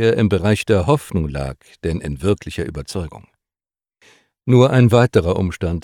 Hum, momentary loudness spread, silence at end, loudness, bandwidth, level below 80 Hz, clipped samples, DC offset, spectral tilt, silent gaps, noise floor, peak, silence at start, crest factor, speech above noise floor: none; 15 LU; 0.05 s; -18 LUFS; 13.5 kHz; -36 dBFS; under 0.1%; under 0.1%; -7 dB/octave; none; under -90 dBFS; -2 dBFS; 0 s; 16 dB; over 73 dB